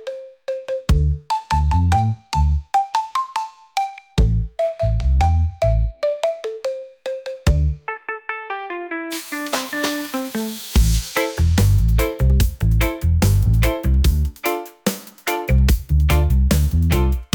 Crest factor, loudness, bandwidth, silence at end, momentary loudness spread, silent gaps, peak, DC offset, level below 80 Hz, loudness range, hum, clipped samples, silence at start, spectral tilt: 14 dB; -20 LUFS; 19.5 kHz; 0.1 s; 10 LU; none; -6 dBFS; under 0.1%; -22 dBFS; 6 LU; none; under 0.1%; 0 s; -6 dB/octave